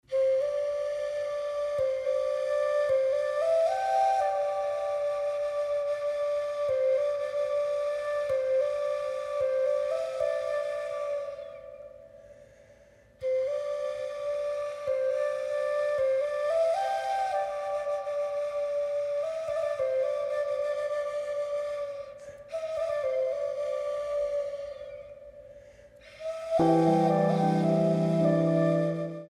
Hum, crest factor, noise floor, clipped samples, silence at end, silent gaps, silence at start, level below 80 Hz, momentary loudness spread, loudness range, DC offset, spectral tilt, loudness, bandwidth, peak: none; 16 dB; -57 dBFS; under 0.1%; 0 s; none; 0.1 s; -66 dBFS; 10 LU; 7 LU; under 0.1%; -7 dB/octave; -29 LUFS; 11.5 kHz; -12 dBFS